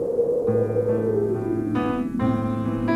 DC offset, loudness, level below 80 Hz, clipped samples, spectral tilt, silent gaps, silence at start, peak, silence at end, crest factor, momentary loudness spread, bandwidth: under 0.1%; -23 LUFS; -46 dBFS; under 0.1%; -9.5 dB/octave; none; 0 s; -10 dBFS; 0 s; 12 dB; 3 LU; 12 kHz